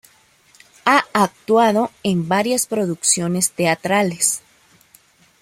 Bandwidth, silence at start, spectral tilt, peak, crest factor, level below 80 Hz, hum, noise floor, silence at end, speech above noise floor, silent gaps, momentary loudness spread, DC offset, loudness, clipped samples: 16.5 kHz; 0.85 s; -3.5 dB/octave; -2 dBFS; 18 dB; -62 dBFS; none; -54 dBFS; 1 s; 36 dB; none; 5 LU; under 0.1%; -18 LUFS; under 0.1%